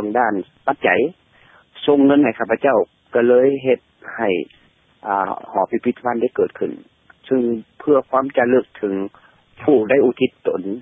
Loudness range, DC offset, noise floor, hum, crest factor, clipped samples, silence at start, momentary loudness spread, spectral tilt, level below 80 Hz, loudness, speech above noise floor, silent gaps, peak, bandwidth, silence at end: 5 LU; under 0.1%; -52 dBFS; none; 16 dB; under 0.1%; 0 s; 10 LU; -9.5 dB/octave; -60 dBFS; -18 LUFS; 34 dB; none; -2 dBFS; 3.8 kHz; 0 s